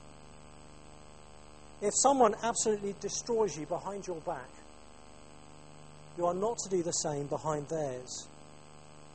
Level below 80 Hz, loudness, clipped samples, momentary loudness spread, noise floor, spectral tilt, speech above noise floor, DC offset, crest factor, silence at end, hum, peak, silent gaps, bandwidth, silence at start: -62 dBFS; -32 LUFS; under 0.1%; 27 LU; -55 dBFS; -3.5 dB/octave; 23 dB; 0.2%; 22 dB; 0.05 s; 50 Hz at -60 dBFS; -12 dBFS; none; 8.8 kHz; 0.05 s